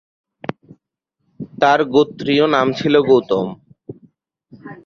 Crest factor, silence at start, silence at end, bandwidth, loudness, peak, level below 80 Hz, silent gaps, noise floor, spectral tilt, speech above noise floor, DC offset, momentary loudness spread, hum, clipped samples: 18 dB; 1.4 s; 0.1 s; 7 kHz; -16 LUFS; -2 dBFS; -58 dBFS; none; -74 dBFS; -6 dB/octave; 59 dB; under 0.1%; 21 LU; none; under 0.1%